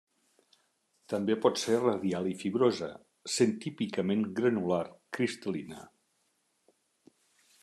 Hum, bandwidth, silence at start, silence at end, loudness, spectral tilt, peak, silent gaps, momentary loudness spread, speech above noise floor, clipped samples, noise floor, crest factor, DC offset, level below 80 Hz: none; 13 kHz; 1.1 s; 1.75 s; -31 LUFS; -5 dB/octave; -12 dBFS; none; 11 LU; 45 dB; under 0.1%; -75 dBFS; 20 dB; under 0.1%; -78 dBFS